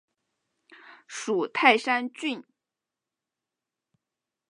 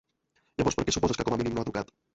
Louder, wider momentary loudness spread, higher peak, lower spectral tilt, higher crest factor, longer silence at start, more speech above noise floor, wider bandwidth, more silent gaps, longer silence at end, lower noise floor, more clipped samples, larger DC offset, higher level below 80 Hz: first, -25 LUFS vs -29 LUFS; first, 17 LU vs 9 LU; first, -4 dBFS vs -12 dBFS; second, -2.5 dB/octave vs -4.5 dB/octave; first, 28 dB vs 18 dB; first, 1.1 s vs 0.6 s; first, 63 dB vs 44 dB; first, 11 kHz vs 8.2 kHz; neither; first, 2.1 s vs 0.3 s; first, -88 dBFS vs -73 dBFS; neither; neither; second, -88 dBFS vs -48 dBFS